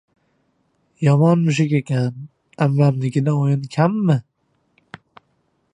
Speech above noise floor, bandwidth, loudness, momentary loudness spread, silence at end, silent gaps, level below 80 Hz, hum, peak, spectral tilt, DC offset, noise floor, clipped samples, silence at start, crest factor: 49 dB; 9.8 kHz; -18 LUFS; 7 LU; 1.55 s; none; -64 dBFS; none; -2 dBFS; -8 dB/octave; under 0.1%; -66 dBFS; under 0.1%; 1 s; 18 dB